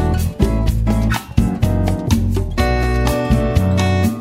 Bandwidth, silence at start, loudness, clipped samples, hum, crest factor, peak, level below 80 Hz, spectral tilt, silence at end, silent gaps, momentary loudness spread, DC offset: 16 kHz; 0 s; -17 LUFS; under 0.1%; none; 14 dB; 0 dBFS; -20 dBFS; -6.5 dB/octave; 0 s; none; 3 LU; under 0.1%